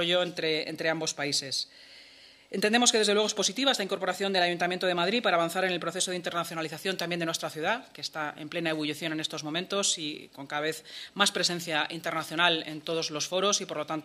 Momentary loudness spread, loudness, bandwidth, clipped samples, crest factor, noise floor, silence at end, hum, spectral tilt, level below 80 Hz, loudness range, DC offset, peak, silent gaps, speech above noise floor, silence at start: 9 LU; -28 LUFS; 15.5 kHz; under 0.1%; 22 dB; -54 dBFS; 0 s; none; -2.5 dB/octave; -76 dBFS; 6 LU; under 0.1%; -8 dBFS; none; 25 dB; 0 s